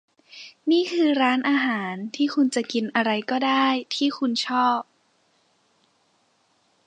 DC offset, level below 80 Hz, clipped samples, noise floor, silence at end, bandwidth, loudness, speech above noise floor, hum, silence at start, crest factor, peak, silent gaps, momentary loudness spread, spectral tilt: under 0.1%; -80 dBFS; under 0.1%; -66 dBFS; 2.05 s; 10 kHz; -23 LUFS; 43 dB; none; 0.35 s; 18 dB; -6 dBFS; none; 8 LU; -4 dB/octave